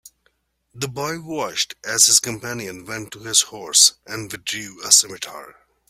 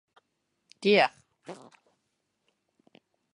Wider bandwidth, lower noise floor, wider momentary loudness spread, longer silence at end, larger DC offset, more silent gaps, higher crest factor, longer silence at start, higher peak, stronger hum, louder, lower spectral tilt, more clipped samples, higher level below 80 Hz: first, 16 kHz vs 10.5 kHz; second, -66 dBFS vs -79 dBFS; second, 18 LU vs 25 LU; second, 0.4 s vs 1.8 s; neither; neither; about the same, 22 dB vs 26 dB; about the same, 0.75 s vs 0.8 s; first, 0 dBFS vs -8 dBFS; neither; first, -17 LUFS vs -25 LUFS; second, -0.5 dB/octave vs -5 dB/octave; neither; first, -62 dBFS vs -84 dBFS